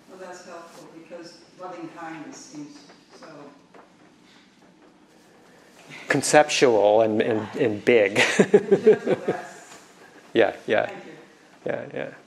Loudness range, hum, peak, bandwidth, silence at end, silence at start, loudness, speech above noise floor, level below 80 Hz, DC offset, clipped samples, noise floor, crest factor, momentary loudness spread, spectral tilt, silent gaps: 22 LU; none; 0 dBFS; 13 kHz; 0.1 s; 0.2 s; -21 LUFS; 31 dB; -72 dBFS; under 0.1%; under 0.1%; -54 dBFS; 24 dB; 24 LU; -4 dB/octave; none